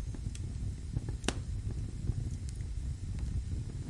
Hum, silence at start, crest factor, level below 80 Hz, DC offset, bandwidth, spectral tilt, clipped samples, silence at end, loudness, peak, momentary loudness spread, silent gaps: none; 0 s; 24 dB; -40 dBFS; under 0.1%; 11.5 kHz; -5.5 dB/octave; under 0.1%; 0 s; -39 LUFS; -12 dBFS; 4 LU; none